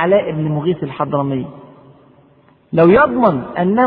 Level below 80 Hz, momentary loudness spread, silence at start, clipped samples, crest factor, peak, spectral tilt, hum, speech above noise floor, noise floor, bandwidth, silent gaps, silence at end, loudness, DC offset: -48 dBFS; 11 LU; 0 s; under 0.1%; 16 dB; 0 dBFS; -11 dB/octave; none; 36 dB; -50 dBFS; 4.8 kHz; none; 0 s; -15 LUFS; under 0.1%